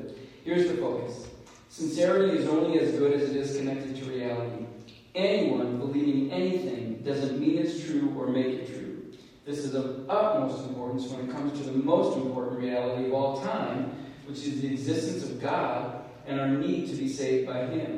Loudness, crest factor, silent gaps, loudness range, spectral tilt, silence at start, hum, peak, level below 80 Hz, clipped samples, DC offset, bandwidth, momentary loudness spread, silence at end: -29 LUFS; 20 dB; none; 4 LU; -6.5 dB/octave; 0 s; none; -10 dBFS; -66 dBFS; under 0.1%; under 0.1%; 11.5 kHz; 13 LU; 0 s